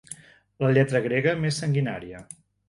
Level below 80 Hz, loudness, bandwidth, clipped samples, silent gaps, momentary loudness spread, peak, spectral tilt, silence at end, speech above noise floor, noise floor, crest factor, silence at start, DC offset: -60 dBFS; -24 LUFS; 11.5 kHz; under 0.1%; none; 21 LU; -6 dBFS; -6 dB/octave; 0.35 s; 23 dB; -46 dBFS; 18 dB; 0.1 s; under 0.1%